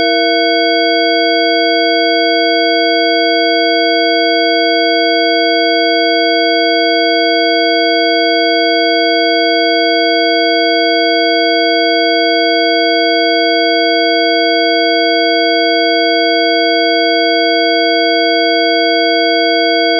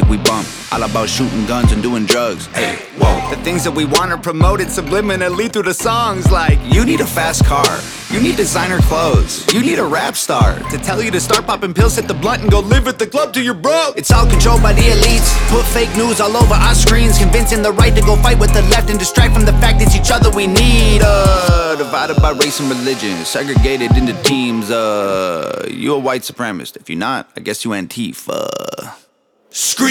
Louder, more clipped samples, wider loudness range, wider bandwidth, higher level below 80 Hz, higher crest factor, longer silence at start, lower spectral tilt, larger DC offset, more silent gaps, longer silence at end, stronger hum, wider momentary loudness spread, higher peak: first, -10 LUFS vs -14 LUFS; neither; second, 0 LU vs 6 LU; second, 5 kHz vs 17.5 kHz; second, under -90 dBFS vs -16 dBFS; about the same, 10 dB vs 12 dB; about the same, 0 s vs 0 s; second, 4.5 dB/octave vs -4.5 dB/octave; neither; neither; about the same, 0 s vs 0 s; neither; second, 0 LU vs 9 LU; about the same, 0 dBFS vs 0 dBFS